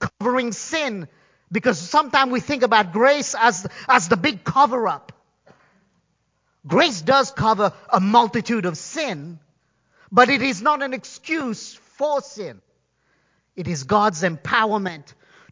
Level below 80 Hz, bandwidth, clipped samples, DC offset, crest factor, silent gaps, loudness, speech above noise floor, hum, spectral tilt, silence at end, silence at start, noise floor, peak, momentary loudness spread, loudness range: -56 dBFS; 7.6 kHz; under 0.1%; under 0.1%; 20 dB; none; -20 LUFS; 49 dB; none; -4 dB/octave; 0.5 s; 0 s; -69 dBFS; 0 dBFS; 15 LU; 6 LU